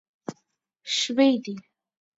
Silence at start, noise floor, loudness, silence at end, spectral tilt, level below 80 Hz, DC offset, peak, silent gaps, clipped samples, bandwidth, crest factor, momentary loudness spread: 0.3 s; -73 dBFS; -23 LUFS; 0.6 s; -3 dB/octave; -78 dBFS; under 0.1%; -8 dBFS; none; under 0.1%; 7.8 kHz; 20 dB; 20 LU